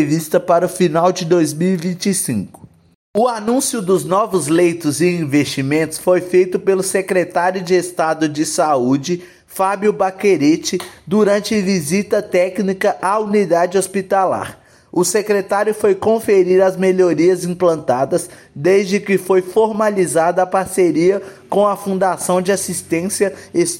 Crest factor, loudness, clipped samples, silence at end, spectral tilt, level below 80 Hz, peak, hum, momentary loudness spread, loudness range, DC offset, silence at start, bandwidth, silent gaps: 14 dB; -16 LUFS; under 0.1%; 0 s; -5 dB/octave; -60 dBFS; -2 dBFS; none; 5 LU; 2 LU; under 0.1%; 0 s; 17 kHz; 2.95-3.14 s